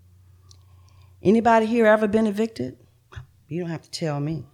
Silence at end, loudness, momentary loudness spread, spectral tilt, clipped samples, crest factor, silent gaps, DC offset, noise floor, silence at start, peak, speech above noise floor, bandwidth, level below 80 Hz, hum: 0.1 s; -22 LUFS; 15 LU; -6.5 dB/octave; under 0.1%; 18 dB; none; under 0.1%; -52 dBFS; 1.25 s; -6 dBFS; 31 dB; 13 kHz; -56 dBFS; none